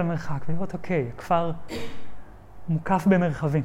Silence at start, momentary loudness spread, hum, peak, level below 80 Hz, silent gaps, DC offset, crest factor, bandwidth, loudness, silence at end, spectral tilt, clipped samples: 0 s; 15 LU; none; -8 dBFS; -48 dBFS; none; under 0.1%; 16 dB; 13.5 kHz; -26 LUFS; 0 s; -8 dB/octave; under 0.1%